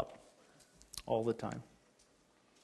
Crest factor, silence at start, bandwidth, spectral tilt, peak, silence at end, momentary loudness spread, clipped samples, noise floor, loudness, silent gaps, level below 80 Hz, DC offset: 22 dB; 0 s; 12.5 kHz; -5.5 dB/octave; -20 dBFS; 1 s; 26 LU; under 0.1%; -70 dBFS; -40 LUFS; none; -68 dBFS; under 0.1%